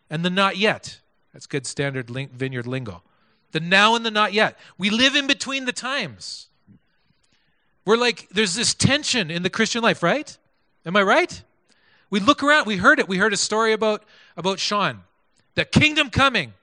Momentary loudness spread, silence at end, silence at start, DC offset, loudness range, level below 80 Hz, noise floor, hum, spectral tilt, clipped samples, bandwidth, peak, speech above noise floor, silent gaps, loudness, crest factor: 14 LU; 0.1 s; 0.1 s; under 0.1%; 5 LU; -54 dBFS; -67 dBFS; none; -3.5 dB/octave; under 0.1%; 10.5 kHz; 0 dBFS; 46 dB; none; -20 LUFS; 22 dB